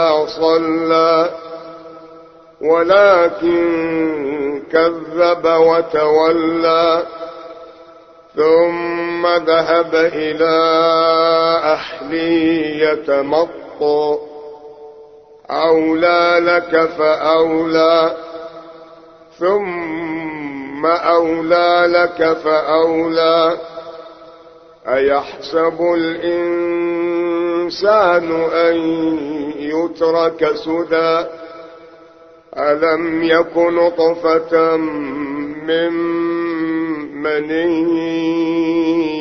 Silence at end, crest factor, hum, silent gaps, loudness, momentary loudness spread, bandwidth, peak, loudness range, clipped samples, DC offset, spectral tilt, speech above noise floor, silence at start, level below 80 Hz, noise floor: 0 s; 16 dB; none; none; -15 LUFS; 11 LU; 6.2 kHz; 0 dBFS; 4 LU; under 0.1%; under 0.1%; -6 dB/octave; 29 dB; 0 s; -54 dBFS; -43 dBFS